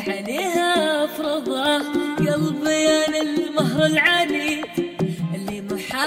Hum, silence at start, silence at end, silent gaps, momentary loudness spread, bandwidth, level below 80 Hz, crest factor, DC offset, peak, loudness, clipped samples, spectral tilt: none; 0 s; 0 s; none; 10 LU; 16 kHz; -56 dBFS; 16 dB; under 0.1%; -4 dBFS; -21 LUFS; under 0.1%; -4.5 dB/octave